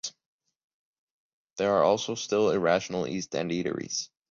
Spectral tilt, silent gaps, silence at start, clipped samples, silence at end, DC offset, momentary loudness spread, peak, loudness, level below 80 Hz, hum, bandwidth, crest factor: -4 dB/octave; 0.26-0.39 s, 0.64-1.56 s; 0.05 s; under 0.1%; 0.25 s; under 0.1%; 9 LU; -10 dBFS; -27 LUFS; -64 dBFS; none; 7.8 kHz; 20 dB